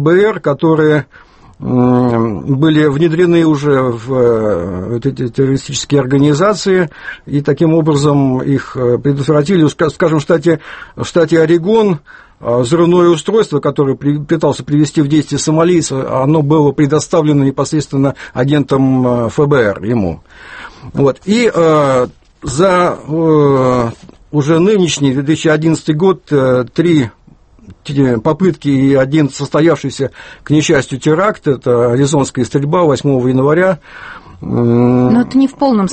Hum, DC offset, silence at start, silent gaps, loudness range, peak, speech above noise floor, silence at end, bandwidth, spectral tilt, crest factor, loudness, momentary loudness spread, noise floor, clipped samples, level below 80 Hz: none; under 0.1%; 0 s; none; 2 LU; 0 dBFS; 31 dB; 0 s; 8.8 kHz; -6.5 dB/octave; 12 dB; -12 LUFS; 9 LU; -43 dBFS; under 0.1%; -42 dBFS